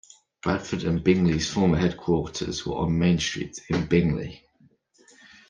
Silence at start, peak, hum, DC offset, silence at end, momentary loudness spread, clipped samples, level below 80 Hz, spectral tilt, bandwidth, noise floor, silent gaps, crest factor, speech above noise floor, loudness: 0.45 s; -6 dBFS; none; under 0.1%; 1.1 s; 8 LU; under 0.1%; -46 dBFS; -6 dB/octave; 9.2 kHz; -61 dBFS; none; 18 dB; 37 dB; -25 LUFS